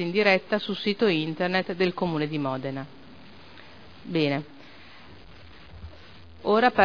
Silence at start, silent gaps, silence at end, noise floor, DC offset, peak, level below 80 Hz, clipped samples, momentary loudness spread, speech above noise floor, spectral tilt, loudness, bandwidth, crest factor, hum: 0 s; none; 0 s; -49 dBFS; 0.4%; -6 dBFS; -58 dBFS; under 0.1%; 26 LU; 24 dB; -7 dB/octave; -26 LUFS; 5.4 kHz; 22 dB; none